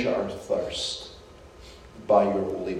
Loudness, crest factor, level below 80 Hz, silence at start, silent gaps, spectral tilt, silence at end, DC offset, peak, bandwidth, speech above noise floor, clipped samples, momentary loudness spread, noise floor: -26 LUFS; 20 dB; -52 dBFS; 0 s; none; -4.5 dB/octave; 0 s; under 0.1%; -8 dBFS; 12 kHz; 22 dB; under 0.1%; 25 LU; -48 dBFS